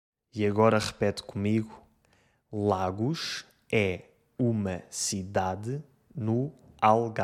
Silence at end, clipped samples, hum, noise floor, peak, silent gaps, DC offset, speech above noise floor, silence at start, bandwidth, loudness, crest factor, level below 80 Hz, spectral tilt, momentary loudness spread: 0 s; under 0.1%; none; -67 dBFS; -6 dBFS; none; under 0.1%; 39 dB; 0.35 s; 14.5 kHz; -29 LUFS; 22 dB; -64 dBFS; -5.5 dB/octave; 15 LU